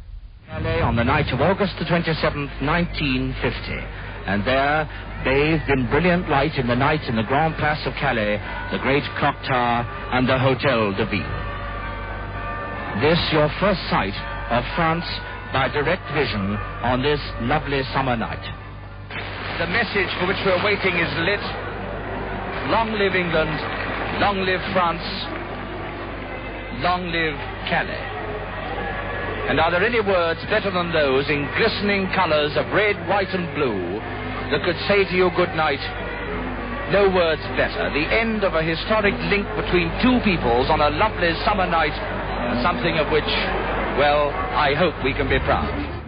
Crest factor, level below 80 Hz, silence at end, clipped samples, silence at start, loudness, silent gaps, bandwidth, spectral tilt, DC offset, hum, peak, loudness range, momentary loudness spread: 18 dB; -34 dBFS; 0 s; under 0.1%; 0 s; -21 LUFS; none; 5.4 kHz; -10.5 dB/octave; under 0.1%; none; -4 dBFS; 4 LU; 10 LU